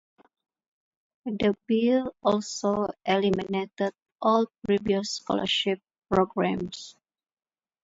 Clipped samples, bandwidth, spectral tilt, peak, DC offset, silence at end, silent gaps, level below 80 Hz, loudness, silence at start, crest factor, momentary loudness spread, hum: under 0.1%; 8 kHz; -5 dB/octave; -8 dBFS; under 0.1%; 0.9 s; 4.12-4.16 s; -60 dBFS; -27 LUFS; 1.25 s; 20 dB; 9 LU; none